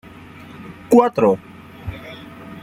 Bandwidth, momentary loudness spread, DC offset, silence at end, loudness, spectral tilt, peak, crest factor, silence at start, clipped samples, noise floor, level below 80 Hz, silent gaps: 16 kHz; 24 LU; under 0.1%; 0.05 s; -16 LUFS; -7 dB/octave; -2 dBFS; 18 dB; 0.6 s; under 0.1%; -40 dBFS; -48 dBFS; none